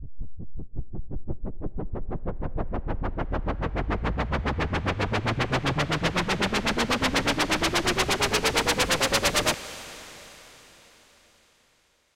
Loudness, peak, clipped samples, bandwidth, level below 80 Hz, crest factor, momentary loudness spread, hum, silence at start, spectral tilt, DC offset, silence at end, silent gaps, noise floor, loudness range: -26 LUFS; -10 dBFS; under 0.1%; 16 kHz; -36 dBFS; 18 dB; 18 LU; none; 0 s; -3.5 dB/octave; under 0.1%; 1.35 s; none; -66 dBFS; 10 LU